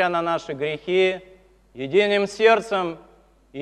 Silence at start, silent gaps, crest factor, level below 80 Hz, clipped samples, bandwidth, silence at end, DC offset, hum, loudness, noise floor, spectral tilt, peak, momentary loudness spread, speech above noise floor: 0 s; none; 18 dB; -60 dBFS; under 0.1%; 10.5 kHz; 0 s; under 0.1%; none; -21 LUFS; -44 dBFS; -5 dB/octave; -4 dBFS; 17 LU; 23 dB